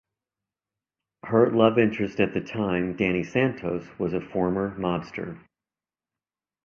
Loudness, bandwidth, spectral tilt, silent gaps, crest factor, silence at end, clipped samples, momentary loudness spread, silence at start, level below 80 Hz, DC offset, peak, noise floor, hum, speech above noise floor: -25 LUFS; 6.8 kHz; -8 dB/octave; none; 22 dB; 1.3 s; under 0.1%; 12 LU; 1.25 s; -56 dBFS; under 0.1%; -4 dBFS; under -90 dBFS; none; over 66 dB